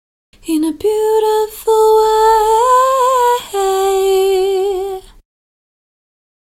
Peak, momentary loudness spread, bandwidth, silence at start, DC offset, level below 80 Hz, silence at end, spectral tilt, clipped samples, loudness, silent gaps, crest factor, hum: -2 dBFS; 8 LU; 16.5 kHz; 0.45 s; under 0.1%; -44 dBFS; 1.5 s; -2.5 dB/octave; under 0.1%; -13 LUFS; none; 12 dB; none